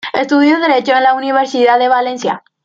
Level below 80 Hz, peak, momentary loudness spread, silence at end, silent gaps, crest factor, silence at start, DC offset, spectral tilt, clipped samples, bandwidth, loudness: -64 dBFS; -2 dBFS; 7 LU; 0.25 s; none; 10 dB; 0.05 s; under 0.1%; -4 dB/octave; under 0.1%; 7.6 kHz; -12 LUFS